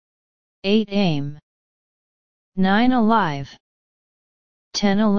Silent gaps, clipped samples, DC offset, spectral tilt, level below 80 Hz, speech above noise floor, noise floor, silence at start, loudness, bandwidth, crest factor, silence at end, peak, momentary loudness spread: 1.43-2.52 s, 3.60-4.71 s; under 0.1%; 3%; -6 dB/octave; -50 dBFS; over 71 dB; under -90 dBFS; 0.6 s; -20 LUFS; 7 kHz; 18 dB; 0 s; -4 dBFS; 15 LU